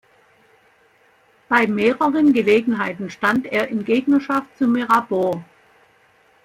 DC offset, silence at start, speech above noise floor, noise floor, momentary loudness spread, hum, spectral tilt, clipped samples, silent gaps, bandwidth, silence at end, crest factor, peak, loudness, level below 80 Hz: under 0.1%; 1.5 s; 38 dB; -56 dBFS; 7 LU; none; -6 dB/octave; under 0.1%; none; 15.5 kHz; 1 s; 18 dB; -2 dBFS; -19 LUFS; -62 dBFS